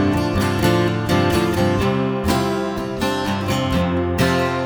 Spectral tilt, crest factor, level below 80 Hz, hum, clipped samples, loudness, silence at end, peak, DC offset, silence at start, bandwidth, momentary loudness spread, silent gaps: -6 dB/octave; 16 dB; -36 dBFS; none; under 0.1%; -19 LUFS; 0 s; -2 dBFS; under 0.1%; 0 s; over 20 kHz; 4 LU; none